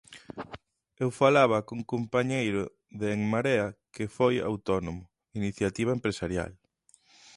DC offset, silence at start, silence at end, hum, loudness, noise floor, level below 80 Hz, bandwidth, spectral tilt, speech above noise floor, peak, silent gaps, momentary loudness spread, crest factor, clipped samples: under 0.1%; 0.1 s; 0.8 s; none; -28 LUFS; -65 dBFS; -54 dBFS; 11.5 kHz; -6 dB/octave; 37 dB; -8 dBFS; none; 19 LU; 22 dB; under 0.1%